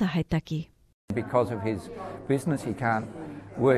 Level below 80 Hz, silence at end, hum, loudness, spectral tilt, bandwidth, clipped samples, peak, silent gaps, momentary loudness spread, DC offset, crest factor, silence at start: -52 dBFS; 0 s; none; -29 LUFS; -7.5 dB/octave; 13.5 kHz; under 0.1%; -10 dBFS; 0.94-1.08 s; 12 LU; under 0.1%; 18 dB; 0 s